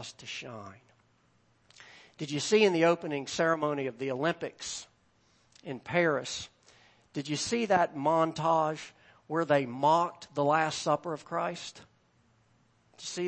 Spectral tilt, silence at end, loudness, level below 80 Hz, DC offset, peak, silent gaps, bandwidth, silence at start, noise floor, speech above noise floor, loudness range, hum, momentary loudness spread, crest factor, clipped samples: -4.5 dB/octave; 0 s; -30 LUFS; -72 dBFS; under 0.1%; -10 dBFS; none; 8.8 kHz; 0 s; -68 dBFS; 38 dB; 5 LU; none; 16 LU; 20 dB; under 0.1%